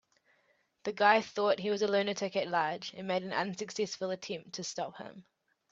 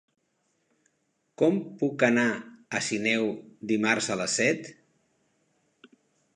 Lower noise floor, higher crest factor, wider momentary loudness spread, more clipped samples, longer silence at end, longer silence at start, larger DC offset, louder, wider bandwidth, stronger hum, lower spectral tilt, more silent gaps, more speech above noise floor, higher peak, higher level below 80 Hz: about the same, -73 dBFS vs -75 dBFS; about the same, 24 dB vs 24 dB; first, 14 LU vs 10 LU; neither; second, 0.5 s vs 1.65 s; second, 0.85 s vs 1.4 s; neither; second, -33 LUFS vs -26 LUFS; second, 8 kHz vs 11 kHz; neither; about the same, -3.5 dB/octave vs -4 dB/octave; neither; second, 40 dB vs 48 dB; second, -10 dBFS vs -6 dBFS; second, -80 dBFS vs -74 dBFS